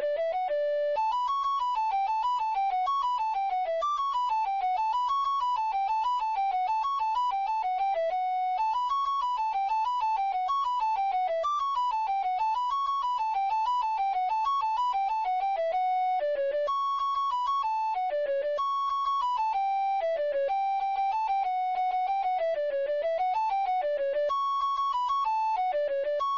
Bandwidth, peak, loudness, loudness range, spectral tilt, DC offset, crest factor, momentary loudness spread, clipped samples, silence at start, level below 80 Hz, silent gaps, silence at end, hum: 7.4 kHz; -22 dBFS; -28 LUFS; 0 LU; -1 dB/octave; under 0.1%; 6 dB; 1 LU; under 0.1%; 0 s; -64 dBFS; none; 0 s; none